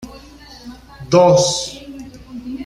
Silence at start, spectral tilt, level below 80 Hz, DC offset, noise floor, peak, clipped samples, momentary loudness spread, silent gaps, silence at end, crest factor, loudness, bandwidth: 0 s; -4.5 dB/octave; -46 dBFS; under 0.1%; -40 dBFS; -2 dBFS; under 0.1%; 26 LU; none; 0 s; 18 dB; -14 LUFS; 12.5 kHz